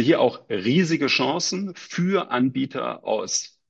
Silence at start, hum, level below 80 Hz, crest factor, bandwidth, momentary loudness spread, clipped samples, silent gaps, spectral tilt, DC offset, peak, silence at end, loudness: 0 s; none; -68 dBFS; 16 dB; 8.8 kHz; 7 LU; under 0.1%; none; -4.5 dB/octave; under 0.1%; -6 dBFS; 0.2 s; -23 LUFS